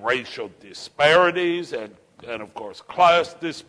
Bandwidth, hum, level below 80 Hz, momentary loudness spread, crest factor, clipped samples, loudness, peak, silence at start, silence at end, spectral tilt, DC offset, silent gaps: 10.5 kHz; none; -62 dBFS; 20 LU; 18 dB; under 0.1%; -19 LUFS; -4 dBFS; 0 s; 0.05 s; -4 dB/octave; under 0.1%; none